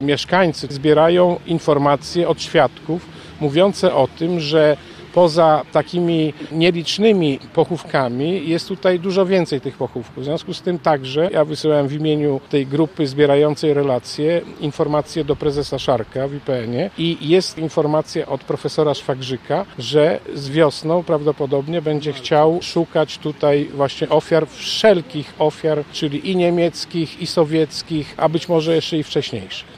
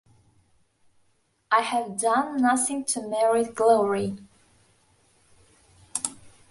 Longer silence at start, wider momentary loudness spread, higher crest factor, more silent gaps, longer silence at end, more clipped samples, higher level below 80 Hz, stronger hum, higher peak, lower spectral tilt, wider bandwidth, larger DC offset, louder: second, 0 s vs 1.5 s; second, 8 LU vs 11 LU; about the same, 16 dB vs 20 dB; neither; second, 0.05 s vs 0.2 s; neither; first, -52 dBFS vs -66 dBFS; neither; first, -2 dBFS vs -6 dBFS; first, -6 dB/octave vs -3.5 dB/octave; first, 13.5 kHz vs 12 kHz; neither; first, -18 LUFS vs -24 LUFS